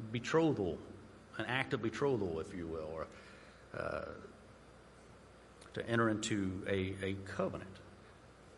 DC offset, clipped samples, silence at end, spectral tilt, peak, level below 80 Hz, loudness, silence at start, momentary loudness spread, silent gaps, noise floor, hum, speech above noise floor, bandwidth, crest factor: under 0.1%; under 0.1%; 0 s; -5.5 dB/octave; -18 dBFS; -64 dBFS; -38 LUFS; 0 s; 25 LU; none; -59 dBFS; none; 22 dB; 11.5 kHz; 22 dB